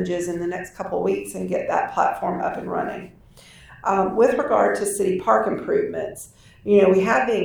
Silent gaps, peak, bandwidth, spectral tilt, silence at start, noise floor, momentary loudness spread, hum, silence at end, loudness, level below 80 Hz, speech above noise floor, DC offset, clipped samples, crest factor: none; -4 dBFS; 19.5 kHz; -5.5 dB/octave; 0 s; -48 dBFS; 13 LU; none; 0 s; -21 LUFS; -54 dBFS; 26 dB; under 0.1%; under 0.1%; 18 dB